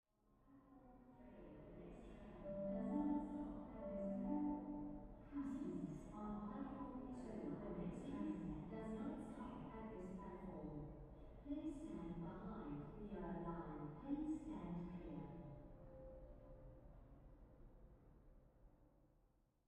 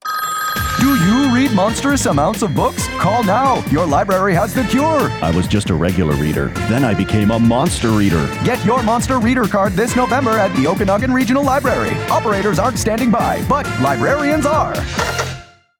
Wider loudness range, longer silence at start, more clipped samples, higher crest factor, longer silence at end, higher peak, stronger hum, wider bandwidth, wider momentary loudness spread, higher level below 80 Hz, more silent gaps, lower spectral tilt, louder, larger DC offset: first, 12 LU vs 1 LU; first, 0.4 s vs 0.05 s; neither; first, 18 dB vs 12 dB; about the same, 0.4 s vs 0.35 s; second, -32 dBFS vs -4 dBFS; neither; second, 9.8 kHz vs 19 kHz; first, 19 LU vs 4 LU; second, -64 dBFS vs -34 dBFS; neither; first, -9 dB/octave vs -5.5 dB/octave; second, -50 LUFS vs -15 LUFS; neither